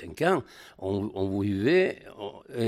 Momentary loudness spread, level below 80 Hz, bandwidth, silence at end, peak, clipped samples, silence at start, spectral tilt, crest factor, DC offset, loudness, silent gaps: 17 LU; -62 dBFS; 14 kHz; 0 s; -12 dBFS; under 0.1%; 0 s; -7 dB/octave; 16 dB; under 0.1%; -27 LUFS; none